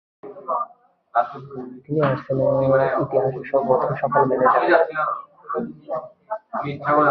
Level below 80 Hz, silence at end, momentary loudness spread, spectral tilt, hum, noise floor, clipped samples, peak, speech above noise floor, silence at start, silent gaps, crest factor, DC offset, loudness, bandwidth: -60 dBFS; 0 s; 16 LU; -10 dB/octave; none; -51 dBFS; under 0.1%; -4 dBFS; 31 dB; 0.25 s; none; 18 dB; under 0.1%; -21 LUFS; 5.2 kHz